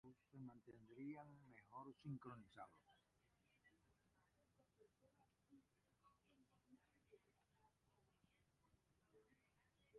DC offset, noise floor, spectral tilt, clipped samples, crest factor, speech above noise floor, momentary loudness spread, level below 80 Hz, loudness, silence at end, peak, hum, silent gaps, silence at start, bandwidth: under 0.1%; -84 dBFS; -7 dB/octave; under 0.1%; 22 dB; 25 dB; 10 LU; under -90 dBFS; -60 LUFS; 0 s; -44 dBFS; none; none; 0.05 s; 4.3 kHz